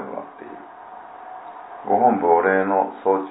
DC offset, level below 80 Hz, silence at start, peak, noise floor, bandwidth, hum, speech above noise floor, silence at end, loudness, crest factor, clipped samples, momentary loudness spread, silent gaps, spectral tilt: under 0.1%; -70 dBFS; 0 s; -4 dBFS; -40 dBFS; 4 kHz; none; 22 dB; 0 s; -19 LUFS; 18 dB; under 0.1%; 22 LU; none; -11 dB/octave